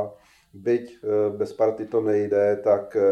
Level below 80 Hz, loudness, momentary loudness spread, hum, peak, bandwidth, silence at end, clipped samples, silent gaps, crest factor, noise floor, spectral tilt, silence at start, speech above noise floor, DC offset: -68 dBFS; -23 LUFS; 5 LU; none; -8 dBFS; 9 kHz; 0 s; under 0.1%; none; 16 dB; -43 dBFS; -8 dB/octave; 0 s; 20 dB; under 0.1%